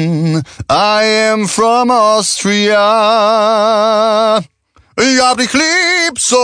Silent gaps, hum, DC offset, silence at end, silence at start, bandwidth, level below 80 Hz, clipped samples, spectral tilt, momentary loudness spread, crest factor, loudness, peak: none; none; under 0.1%; 0 s; 0 s; 10 kHz; -50 dBFS; under 0.1%; -3.5 dB/octave; 5 LU; 12 dB; -11 LUFS; 0 dBFS